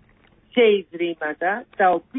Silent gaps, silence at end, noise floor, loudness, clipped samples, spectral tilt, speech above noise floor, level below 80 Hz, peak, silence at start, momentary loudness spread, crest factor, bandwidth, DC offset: none; 0 s; -56 dBFS; -21 LUFS; under 0.1%; -9 dB/octave; 36 dB; -64 dBFS; -6 dBFS; 0.55 s; 8 LU; 16 dB; 3.9 kHz; under 0.1%